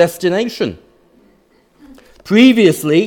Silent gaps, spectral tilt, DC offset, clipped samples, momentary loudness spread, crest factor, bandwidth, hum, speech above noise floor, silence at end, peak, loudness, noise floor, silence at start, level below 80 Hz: none; -5.5 dB/octave; under 0.1%; under 0.1%; 13 LU; 14 dB; 18 kHz; none; 41 dB; 0 s; 0 dBFS; -12 LUFS; -53 dBFS; 0 s; -56 dBFS